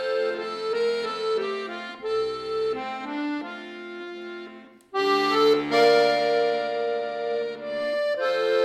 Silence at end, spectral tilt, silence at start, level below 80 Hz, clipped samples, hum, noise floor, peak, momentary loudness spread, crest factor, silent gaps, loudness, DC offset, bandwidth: 0 s; -4 dB/octave; 0 s; -68 dBFS; under 0.1%; none; -45 dBFS; -8 dBFS; 16 LU; 18 dB; none; -25 LUFS; under 0.1%; 12.5 kHz